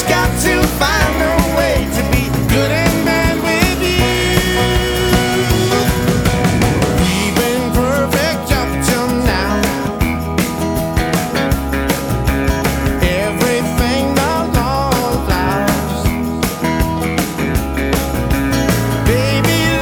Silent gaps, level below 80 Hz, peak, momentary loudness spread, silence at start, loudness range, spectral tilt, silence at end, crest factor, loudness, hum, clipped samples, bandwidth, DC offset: none; -24 dBFS; 0 dBFS; 4 LU; 0 s; 3 LU; -5 dB/octave; 0 s; 14 dB; -15 LUFS; none; under 0.1%; over 20 kHz; under 0.1%